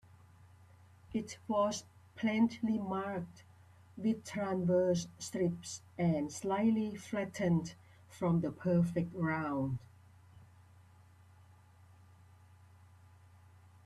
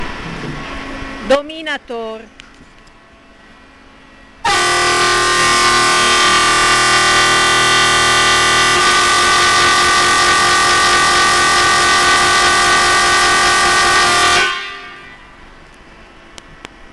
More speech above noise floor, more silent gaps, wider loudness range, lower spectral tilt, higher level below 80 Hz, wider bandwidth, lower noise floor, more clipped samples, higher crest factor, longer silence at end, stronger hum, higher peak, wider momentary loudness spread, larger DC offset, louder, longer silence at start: about the same, 27 dB vs 24 dB; neither; second, 4 LU vs 13 LU; first, -6.5 dB/octave vs -1 dB/octave; second, -68 dBFS vs -38 dBFS; about the same, 13 kHz vs 12.5 kHz; first, -61 dBFS vs -43 dBFS; neither; first, 18 dB vs 10 dB; first, 3.4 s vs 0.05 s; neither; second, -20 dBFS vs -4 dBFS; second, 11 LU vs 16 LU; neither; second, -35 LUFS vs -10 LUFS; first, 1.1 s vs 0 s